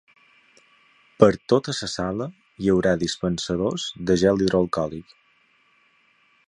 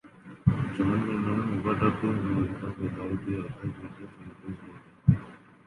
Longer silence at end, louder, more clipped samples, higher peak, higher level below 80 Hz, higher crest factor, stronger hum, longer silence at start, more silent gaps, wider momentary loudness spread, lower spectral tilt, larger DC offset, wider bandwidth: first, 1.45 s vs 0.3 s; first, -22 LUFS vs -29 LUFS; neither; first, 0 dBFS vs -6 dBFS; about the same, -50 dBFS vs -48 dBFS; about the same, 24 dB vs 22 dB; neither; first, 1.2 s vs 0.05 s; neither; second, 9 LU vs 18 LU; second, -5.5 dB/octave vs -9.5 dB/octave; neither; about the same, 11 kHz vs 11 kHz